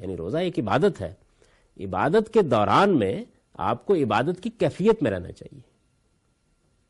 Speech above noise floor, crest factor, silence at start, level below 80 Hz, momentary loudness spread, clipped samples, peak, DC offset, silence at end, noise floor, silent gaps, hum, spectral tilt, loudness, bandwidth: 44 dB; 18 dB; 0 s; -54 dBFS; 15 LU; under 0.1%; -6 dBFS; under 0.1%; 1.3 s; -67 dBFS; none; none; -7 dB/octave; -23 LUFS; 11.5 kHz